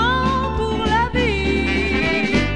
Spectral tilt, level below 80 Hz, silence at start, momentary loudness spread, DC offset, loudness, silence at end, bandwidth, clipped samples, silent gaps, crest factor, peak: -6 dB/octave; -28 dBFS; 0 s; 3 LU; 1%; -19 LUFS; 0 s; 10 kHz; under 0.1%; none; 12 dB; -6 dBFS